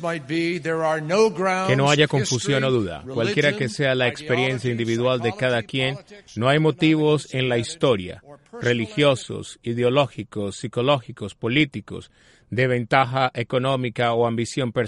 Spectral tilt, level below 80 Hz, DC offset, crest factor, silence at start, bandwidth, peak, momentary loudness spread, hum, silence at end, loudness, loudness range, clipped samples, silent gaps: -5.5 dB/octave; -56 dBFS; under 0.1%; 20 dB; 0 s; 11.5 kHz; -2 dBFS; 11 LU; none; 0 s; -22 LUFS; 3 LU; under 0.1%; none